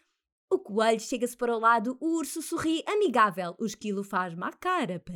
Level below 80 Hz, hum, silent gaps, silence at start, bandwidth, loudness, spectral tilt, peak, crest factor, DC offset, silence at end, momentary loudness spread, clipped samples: -68 dBFS; none; none; 0.5 s; 18.5 kHz; -28 LUFS; -4.5 dB/octave; -10 dBFS; 18 dB; under 0.1%; 0 s; 9 LU; under 0.1%